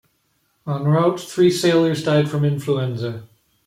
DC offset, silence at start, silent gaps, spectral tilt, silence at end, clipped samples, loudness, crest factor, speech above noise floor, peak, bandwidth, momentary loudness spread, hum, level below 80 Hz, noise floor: under 0.1%; 0.65 s; none; -6.5 dB/octave; 0.4 s; under 0.1%; -19 LUFS; 16 dB; 48 dB; -4 dBFS; 15.5 kHz; 12 LU; none; -60 dBFS; -66 dBFS